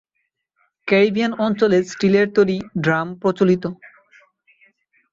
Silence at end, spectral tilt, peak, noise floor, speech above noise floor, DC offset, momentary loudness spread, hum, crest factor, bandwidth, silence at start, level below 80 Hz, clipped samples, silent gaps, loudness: 1.4 s; -6.5 dB/octave; -2 dBFS; -74 dBFS; 57 dB; under 0.1%; 6 LU; none; 18 dB; 7.6 kHz; 0.85 s; -60 dBFS; under 0.1%; none; -18 LUFS